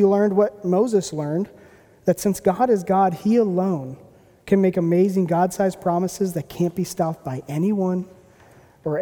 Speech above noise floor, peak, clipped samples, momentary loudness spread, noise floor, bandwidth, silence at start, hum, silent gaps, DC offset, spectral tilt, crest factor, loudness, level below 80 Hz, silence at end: 31 dB; -4 dBFS; under 0.1%; 9 LU; -51 dBFS; 18.5 kHz; 0 s; none; none; under 0.1%; -7 dB/octave; 16 dB; -21 LUFS; -58 dBFS; 0 s